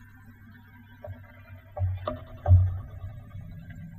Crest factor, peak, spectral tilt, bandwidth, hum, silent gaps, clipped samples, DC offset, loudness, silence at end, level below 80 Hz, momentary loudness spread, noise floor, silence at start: 20 dB; -8 dBFS; -10 dB/octave; 3.9 kHz; none; none; under 0.1%; under 0.1%; -27 LUFS; 0 s; -40 dBFS; 25 LU; -51 dBFS; 0.3 s